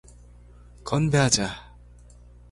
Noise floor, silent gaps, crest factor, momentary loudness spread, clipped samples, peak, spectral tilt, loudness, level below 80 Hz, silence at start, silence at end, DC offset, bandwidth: -49 dBFS; none; 22 dB; 21 LU; under 0.1%; -6 dBFS; -4 dB/octave; -23 LUFS; -46 dBFS; 0.85 s; 0.85 s; under 0.1%; 11.5 kHz